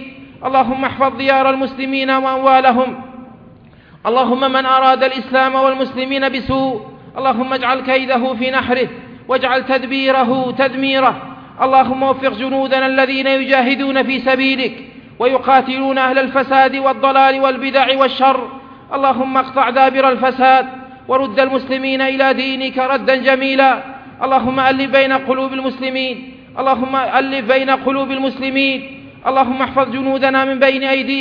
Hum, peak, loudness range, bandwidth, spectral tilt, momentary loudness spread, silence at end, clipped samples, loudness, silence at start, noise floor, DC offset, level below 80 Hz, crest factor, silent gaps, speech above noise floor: none; 0 dBFS; 3 LU; 5.4 kHz; -6.5 dB/octave; 8 LU; 0 s; under 0.1%; -14 LUFS; 0 s; -43 dBFS; under 0.1%; -52 dBFS; 14 dB; none; 28 dB